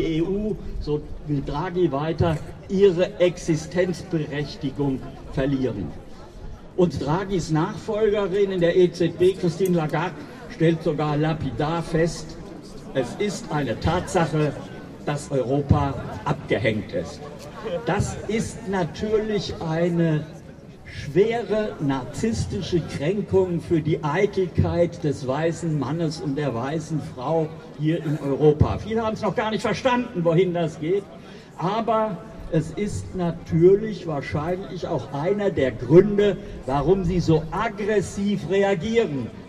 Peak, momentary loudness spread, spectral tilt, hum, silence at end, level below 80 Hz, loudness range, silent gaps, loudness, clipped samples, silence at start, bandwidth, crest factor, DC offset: -4 dBFS; 10 LU; -7 dB/octave; none; 0 s; -42 dBFS; 5 LU; none; -23 LUFS; under 0.1%; 0 s; 13 kHz; 20 dB; under 0.1%